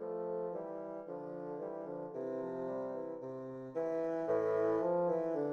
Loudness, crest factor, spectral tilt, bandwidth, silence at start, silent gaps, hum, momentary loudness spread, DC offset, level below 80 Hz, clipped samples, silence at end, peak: -38 LUFS; 14 dB; -9 dB/octave; 6.6 kHz; 0 s; none; none; 12 LU; under 0.1%; -80 dBFS; under 0.1%; 0 s; -22 dBFS